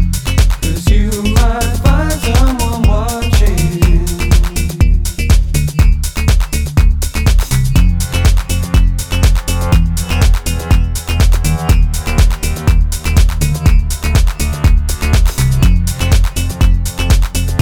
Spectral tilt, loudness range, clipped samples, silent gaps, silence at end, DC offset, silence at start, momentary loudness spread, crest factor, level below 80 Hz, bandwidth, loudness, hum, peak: -5 dB/octave; 1 LU; under 0.1%; none; 0 s; 0.3%; 0 s; 3 LU; 10 dB; -12 dBFS; 17.5 kHz; -14 LUFS; none; 0 dBFS